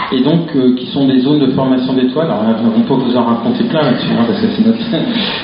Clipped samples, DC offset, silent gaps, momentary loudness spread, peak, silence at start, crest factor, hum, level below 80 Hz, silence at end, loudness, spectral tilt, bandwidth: under 0.1%; under 0.1%; none; 2 LU; 0 dBFS; 0 s; 12 dB; none; -50 dBFS; 0 s; -13 LUFS; -5.5 dB/octave; 5.4 kHz